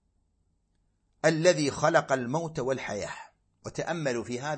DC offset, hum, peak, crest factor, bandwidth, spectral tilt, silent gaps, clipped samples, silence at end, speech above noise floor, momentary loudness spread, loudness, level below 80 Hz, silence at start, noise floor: under 0.1%; none; -8 dBFS; 22 dB; 8.8 kHz; -4.5 dB/octave; none; under 0.1%; 0 s; 45 dB; 15 LU; -28 LUFS; -62 dBFS; 1.25 s; -72 dBFS